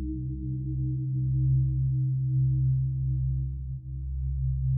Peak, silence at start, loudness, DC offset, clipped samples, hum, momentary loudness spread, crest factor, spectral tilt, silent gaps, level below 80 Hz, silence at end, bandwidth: -16 dBFS; 0 s; -29 LUFS; under 0.1%; under 0.1%; none; 9 LU; 10 dB; -25 dB/octave; none; -34 dBFS; 0 s; 0.4 kHz